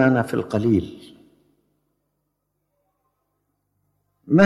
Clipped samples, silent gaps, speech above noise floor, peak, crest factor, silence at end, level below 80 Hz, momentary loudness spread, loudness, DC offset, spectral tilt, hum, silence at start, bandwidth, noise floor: under 0.1%; none; 55 dB; -4 dBFS; 20 dB; 0 s; -56 dBFS; 18 LU; -21 LUFS; under 0.1%; -8 dB/octave; none; 0 s; 12.5 kHz; -75 dBFS